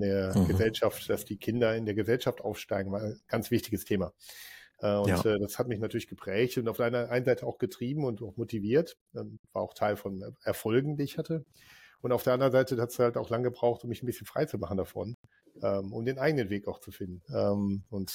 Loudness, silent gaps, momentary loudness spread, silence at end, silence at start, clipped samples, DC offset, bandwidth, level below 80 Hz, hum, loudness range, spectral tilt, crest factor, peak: -31 LUFS; 9.01-9.06 s, 9.39-9.44 s, 15.14-15.24 s; 12 LU; 0 s; 0 s; under 0.1%; under 0.1%; 17 kHz; -58 dBFS; none; 3 LU; -6.5 dB/octave; 16 dB; -14 dBFS